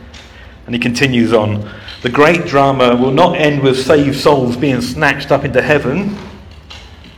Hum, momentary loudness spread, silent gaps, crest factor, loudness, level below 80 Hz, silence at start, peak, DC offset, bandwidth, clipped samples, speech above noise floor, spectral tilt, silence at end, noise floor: none; 12 LU; none; 14 dB; -12 LUFS; -38 dBFS; 0 s; 0 dBFS; under 0.1%; 17 kHz; 0.3%; 24 dB; -6 dB/octave; 0.05 s; -36 dBFS